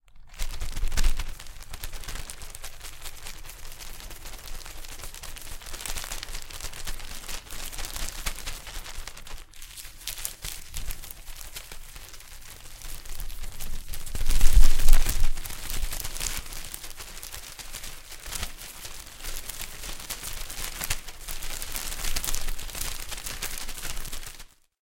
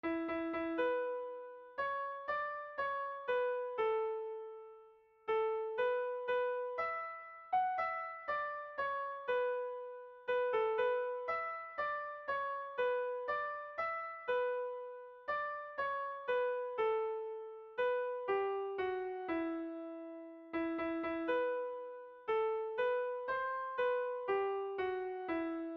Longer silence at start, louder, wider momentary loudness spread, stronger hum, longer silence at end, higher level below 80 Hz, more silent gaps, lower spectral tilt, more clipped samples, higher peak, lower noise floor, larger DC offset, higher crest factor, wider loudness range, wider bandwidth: about the same, 0.15 s vs 0.05 s; first, -34 LUFS vs -38 LUFS; about the same, 11 LU vs 10 LU; neither; first, 0.4 s vs 0 s; first, -28 dBFS vs -76 dBFS; neither; about the same, -2 dB/octave vs -1.5 dB/octave; neither; first, -2 dBFS vs -24 dBFS; second, -47 dBFS vs -63 dBFS; neither; first, 22 dB vs 14 dB; first, 11 LU vs 2 LU; first, 17 kHz vs 5.8 kHz